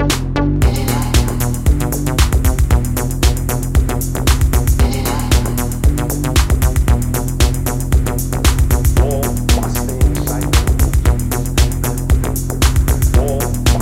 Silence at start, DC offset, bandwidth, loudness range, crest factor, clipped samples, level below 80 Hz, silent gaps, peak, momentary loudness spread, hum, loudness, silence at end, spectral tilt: 0 s; under 0.1%; 16.5 kHz; 1 LU; 14 dB; under 0.1%; -16 dBFS; none; 0 dBFS; 4 LU; none; -16 LUFS; 0 s; -5 dB/octave